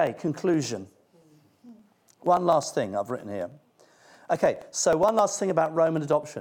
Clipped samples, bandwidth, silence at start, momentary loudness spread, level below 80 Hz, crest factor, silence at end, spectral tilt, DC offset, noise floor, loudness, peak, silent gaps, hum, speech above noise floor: under 0.1%; 17.5 kHz; 0 s; 11 LU; -66 dBFS; 18 dB; 0 s; -5 dB/octave; under 0.1%; -59 dBFS; -25 LUFS; -8 dBFS; none; none; 34 dB